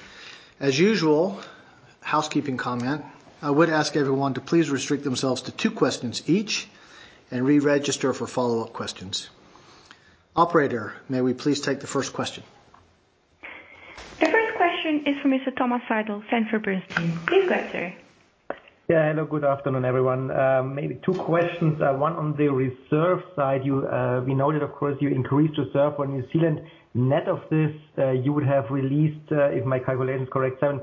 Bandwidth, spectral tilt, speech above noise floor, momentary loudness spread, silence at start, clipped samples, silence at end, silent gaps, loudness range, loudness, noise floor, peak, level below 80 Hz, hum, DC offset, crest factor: 8 kHz; -6 dB/octave; 39 dB; 11 LU; 0 s; under 0.1%; 0 s; none; 3 LU; -24 LUFS; -62 dBFS; -4 dBFS; -62 dBFS; none; under 0.1%; 20 dB